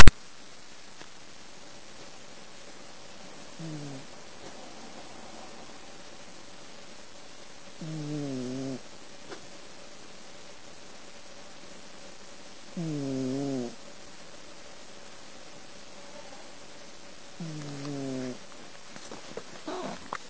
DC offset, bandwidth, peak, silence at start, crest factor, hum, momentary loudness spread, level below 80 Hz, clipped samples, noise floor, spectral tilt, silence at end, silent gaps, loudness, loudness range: under 0.1%; 8 kHz; 0 dBFS; 0 s; 24 dB; none; 13 LU; -42 dBFS; under 0.1%; -51 dBFS; -5 dB/octave; 20.2 s; none; -40 LUFS; 10 LU